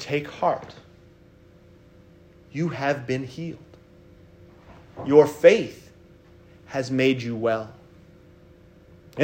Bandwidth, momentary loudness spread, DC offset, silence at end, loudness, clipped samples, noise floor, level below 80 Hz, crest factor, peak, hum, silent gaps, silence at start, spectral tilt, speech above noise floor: 16 kHz; 22 LU; under 0.1%; 0 s; -23 LUFS; under 0.1%; -52 dBFS; -60 dBFS; 24 dB; -2 dBFS; none; none; 0 s; -6 dB/octave; 30 dB